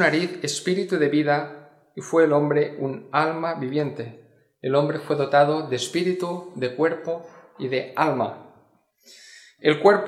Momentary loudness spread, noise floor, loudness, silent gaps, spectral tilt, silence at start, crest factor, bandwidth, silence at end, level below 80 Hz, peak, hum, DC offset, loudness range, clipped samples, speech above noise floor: 14 LU; -60 dBFS; -23 LUFS; none; -5.5 dB/octave; 0 s; 22 dB; 14 kHz; 0 s; -74 dBFS; -2 dBFS; none; under 0.1%; 4 LU; under 0.1%; 38 dB